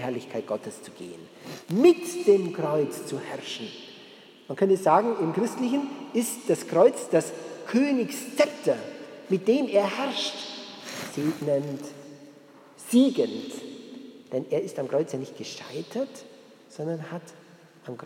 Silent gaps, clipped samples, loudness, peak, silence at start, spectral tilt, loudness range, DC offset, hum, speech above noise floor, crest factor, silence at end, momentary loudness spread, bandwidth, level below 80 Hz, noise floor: none; under 0.1%; -26 LUFS; -6 dBFS; 0 s; -5 dB/octave; 8 LU; under 0.1%; none; 26 dB; 20 dB; 0 s; 21 LU; 17 kHz; -84 dBFS; -51 dBFS